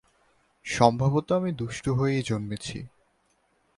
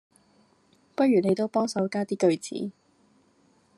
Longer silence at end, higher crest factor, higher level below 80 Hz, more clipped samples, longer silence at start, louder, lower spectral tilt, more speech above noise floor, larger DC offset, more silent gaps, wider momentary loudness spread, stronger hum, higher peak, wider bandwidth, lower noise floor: second, 0.9 s vs 1.1 s; first, 24 dB vs 18 dB; first, -54 dBFS vs -76 dBFS; neither; second, 0.65 s vs 1 s; about the same, -26 LUFS vs -26 LUFS; about the same, -6 dB/octave vs -6 dB/octave; first, 43 dB vs 39 dB; neither; neither; first, 17 LU vs 13 LU; neither; first, -4 dBFS vs -10 dBFS; about the same, 11.5 kHz vs 12 kHz; first, -69 dBFS vs -64 dBFS